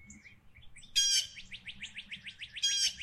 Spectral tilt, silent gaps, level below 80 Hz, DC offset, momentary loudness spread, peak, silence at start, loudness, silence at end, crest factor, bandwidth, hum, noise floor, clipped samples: 2.5 dB/octave; none; -62 dBFS; under 0.1%; 18 LU; -16 dBFS; 0 s; -29 LUFS; 0 s; 20 dB; 15.5 kHz; none; -56 dBFS; under 0.1%